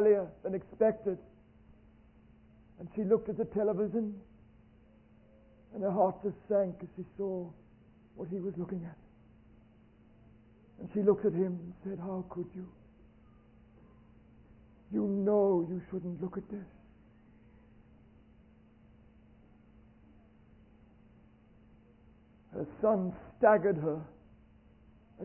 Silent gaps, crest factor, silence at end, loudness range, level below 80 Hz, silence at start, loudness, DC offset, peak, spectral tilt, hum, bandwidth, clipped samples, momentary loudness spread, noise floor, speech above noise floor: none; 24 dB; 0 s; 12 LU; -64 dBFS; 0 s; -33 LUFS; under 0.1%; -10 dBFS; -5 dB/octave; none; 3 kHz; under 0.1%; 18 LU; -61 dBFS; 29 dB